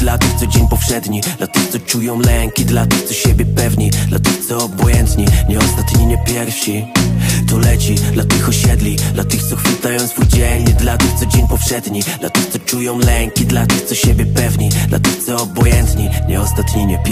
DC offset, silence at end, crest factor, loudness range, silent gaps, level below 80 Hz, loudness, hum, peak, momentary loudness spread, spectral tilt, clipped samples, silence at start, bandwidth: under 0.1%; 0 s; 12 dB; 1 LU; none; -18 dBFS; -14 LUFS; none; 0 dBFS; 4 LU; -4.5 dB/octave; under 0.1%; 0 s; 15.5 kHz